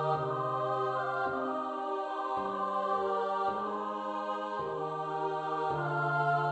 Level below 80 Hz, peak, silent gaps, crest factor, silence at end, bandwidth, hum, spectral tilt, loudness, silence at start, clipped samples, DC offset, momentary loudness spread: -70 dBFS; -18 dBFS; none; 14 dB; 0 s; 8.4 kHz; none; -7 dB/octave; -33 LUFS; 0 s; under 0.1%; under 0.1%; 4 LU